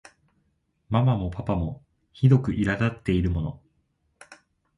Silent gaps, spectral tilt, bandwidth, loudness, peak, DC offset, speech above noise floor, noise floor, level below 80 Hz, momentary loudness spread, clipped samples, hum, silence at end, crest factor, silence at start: none; -8.5 dB/octave; 10.5 kHz; -25 LUFS; -6 dBFS; under 0.1%; 48 dB; -71 dBFS; -40 dBFS; 11 LU; under 0.1%; none; 0.45 s; 20 dB; 0.9 s